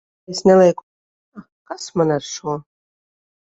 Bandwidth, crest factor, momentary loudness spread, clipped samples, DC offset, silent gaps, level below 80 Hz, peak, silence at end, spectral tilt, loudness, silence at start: 8 kHz; 18 dB; 19 LU; under 0.1%; under 0.1%; 0.83-1.32 s, 1.52-1.65 s; -60 dBFS; -2 dBFS; 0.8 s; -5.5 dB/octave; -18 LUFS; 0.3 s